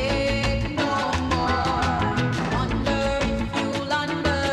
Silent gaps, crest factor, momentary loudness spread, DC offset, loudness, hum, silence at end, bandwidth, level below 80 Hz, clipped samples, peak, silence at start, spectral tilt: none; 12 dB; 2 LU; under 0.1%; -24 LUFS; none; 0 s; 12 kHz; -34 dBFS; under 0.1%; -12 dBFS; 0 s; -5.5 dB/octave